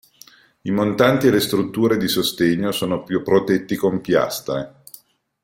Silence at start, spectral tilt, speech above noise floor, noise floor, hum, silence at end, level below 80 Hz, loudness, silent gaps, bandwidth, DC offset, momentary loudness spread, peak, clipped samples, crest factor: 0.65 s; -5 dB/octave; 30 dB; -49 dBFS; none; 0.75 s; -54 dBFS; -19 LUFS; none; 16.5 kHz; under 0.1%; 9 LU; -2 dBFS; under 0.1%; 18 dB